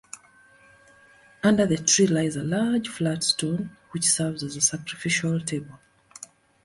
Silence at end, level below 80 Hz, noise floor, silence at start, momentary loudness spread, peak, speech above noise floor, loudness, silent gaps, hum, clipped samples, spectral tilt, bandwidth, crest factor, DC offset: 0.4 s; -60 dBFS; -55 dBFS; 0.15 s; 23 LU; -8 dBFS; 31 dB; -24 LUFS; none; none; under 0.1%; -3.5 dB/octave; 11.5 kHz; 18 dB; under 0.1%